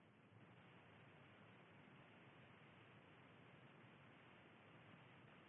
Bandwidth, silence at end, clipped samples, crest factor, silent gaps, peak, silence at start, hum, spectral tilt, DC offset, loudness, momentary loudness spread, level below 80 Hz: 3.8 kHz; 0 s; under 0.1%; 14 dB; none; -54 dBFS; 0 s; none; -3.5 dB/octave; under 0.1%; -66 LUFS; 1 LU; under -90 dBFS